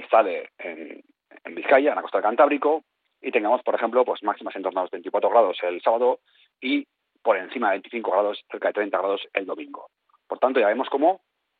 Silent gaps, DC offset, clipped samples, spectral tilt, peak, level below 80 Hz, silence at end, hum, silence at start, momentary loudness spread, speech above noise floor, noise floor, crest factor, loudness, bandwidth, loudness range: none; under 0.1%; under 0.1%; -1 dB/octave; -4 dBFS; -80 dBFS; 0.45 s; none; 0 s; 16 LU; 20 dB; -43 dBFS; 18 dB; -23 LUFS; 4.6 kHz; 3 LU